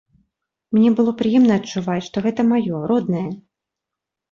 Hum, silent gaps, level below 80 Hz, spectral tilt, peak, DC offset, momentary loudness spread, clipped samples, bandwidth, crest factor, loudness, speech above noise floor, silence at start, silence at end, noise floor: none; none; -58 dBFS; -7 dB/octave; -6 dBFS; under 0.1%; 9 LU; under 0.1%; 7.2 kHz; 14 dB; -19 LUFS; 67 dB; 0.7 s; 0.95 s; -84 dBFS